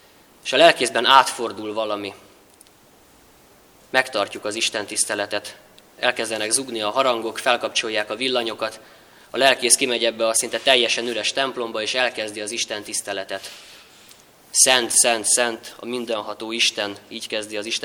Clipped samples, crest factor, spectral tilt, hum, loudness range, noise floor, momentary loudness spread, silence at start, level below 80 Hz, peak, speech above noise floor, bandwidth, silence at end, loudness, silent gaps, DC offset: under 0.1%; 22 dB; -0.5 dB/octave; none; 6 LU; -52 dBFS; 14 LU; 0.45 s; -68 dBFS; 0 dBFS; 31 dB; over 20 kHz; 0 s; -20 LUFS; none; under 0.1%